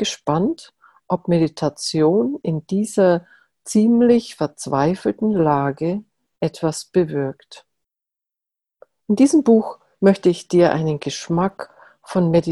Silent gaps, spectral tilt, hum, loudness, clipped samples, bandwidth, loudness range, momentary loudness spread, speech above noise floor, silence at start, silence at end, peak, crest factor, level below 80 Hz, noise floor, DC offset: none; -6.5 dB/octave; none; -19 LUFS; under 0.1%; 12.5 kHz; 5 LU; 11 LU; 69 dB; 0 s; 0 s; -2 dBFS; 16 dB; -56 dBFS; -87 dBFS; under 0.1%